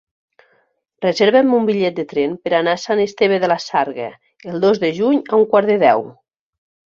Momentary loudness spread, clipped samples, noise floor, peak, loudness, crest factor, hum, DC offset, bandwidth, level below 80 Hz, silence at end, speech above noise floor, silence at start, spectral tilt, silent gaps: 10 LU; under 0.1%; -62 dBFS; -2 dBFS; -16 LUFS; 16 dB; none; under 0.1%; 7.4 kHz; -62 dBFS; 0.85 s; 46 dB; 1 s; -5.5 dB/octave; none